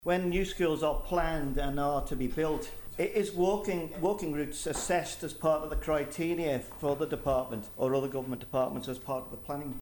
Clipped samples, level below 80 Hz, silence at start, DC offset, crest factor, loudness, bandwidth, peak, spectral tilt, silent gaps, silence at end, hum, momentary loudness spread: under 0.1%; -42 dBFS; 0 s; under 0.1%; 16 dB; -32 LUFS; 19 kHz; -16 dBFS; -5.5 dB/octave; none; 0 s; none; 7 LU